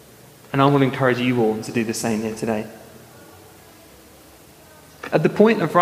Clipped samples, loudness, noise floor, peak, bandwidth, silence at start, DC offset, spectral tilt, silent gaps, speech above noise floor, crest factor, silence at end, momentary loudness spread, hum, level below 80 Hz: under 0.1%; -20 LUFS; -47 dBFS; -2 dBFS; 15.5 kHz; 0.55 s; under 0.1%; -6 dB/octave; none; 28 dB; 20 dB; 0 s; 10 LU; none; -60 dBFS